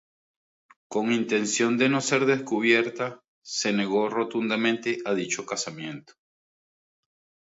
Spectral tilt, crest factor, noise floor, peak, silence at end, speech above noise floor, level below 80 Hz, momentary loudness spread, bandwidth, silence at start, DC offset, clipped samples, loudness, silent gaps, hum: -3.5 dB/octave; 20 dB; under -90 dBFS; -8 dBFS; 1.6 s; over 65 dB; -76 dBFS; 11 LU; 8 kHz; 0.9 s; under 0.1%; under 0.1%; -25 LUFS; 3.28-3.42 s; none